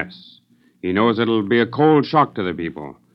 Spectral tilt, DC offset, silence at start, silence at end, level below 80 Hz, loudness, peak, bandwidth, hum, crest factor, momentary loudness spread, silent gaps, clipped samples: -9 dB/octave; under 0.1%; 0 s; 0.25 s; -60 dBFS; -18 LUFS; -2 dBFS; 6 kHz; none; 16 dB; 14 LU; none; under 0.1%